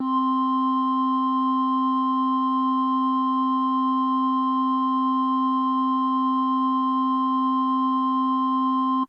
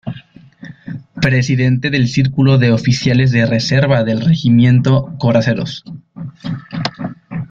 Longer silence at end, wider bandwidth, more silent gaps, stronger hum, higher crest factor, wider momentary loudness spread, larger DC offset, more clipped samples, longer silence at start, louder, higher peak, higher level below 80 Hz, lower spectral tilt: about the same, 0.05 s vs 0.05 s; second, 5.6 kHz vs 7.4 kHz; neither; neither; second, 8 dB vs 14 dB; second, 0 LU vs 19 LU; neither; neither; about the same, 0 s vs 0.05 s; second, -22 LUFS vs -14 LUFS; second, -14 dBFS vs 0 dBFS; second, -86 dBFS vs -44 dBFS; about the same, -6.5 dB/octave vs -7 dB/octave